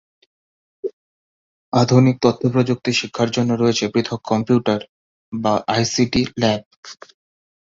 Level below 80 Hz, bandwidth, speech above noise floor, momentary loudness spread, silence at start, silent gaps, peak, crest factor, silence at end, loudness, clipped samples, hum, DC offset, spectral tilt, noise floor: -52 dBFS; 7.8 kHz; over 72 dB; 16 LU; 0.85 s; 0.93-1.72 s, 4.89-5.32 s, 6.66-6.71 s, 6.77-6.83 s; -2 dBFS; 18 dB; 0.75 s; -18 LUFS; under 0.1%; none; under 0.1%; -5.5 dB/octave; under -90 dBFS